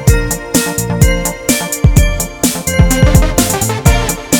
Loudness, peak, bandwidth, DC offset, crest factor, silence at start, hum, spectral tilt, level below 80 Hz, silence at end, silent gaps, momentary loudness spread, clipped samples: -12 LUFS; 0 dBFS; over 20 kHz; under 0.1%; 12 dB; 0 s; none; -4.5 dB/octave; -16 dBFS; 0 s; none; 5 LU; 0.7%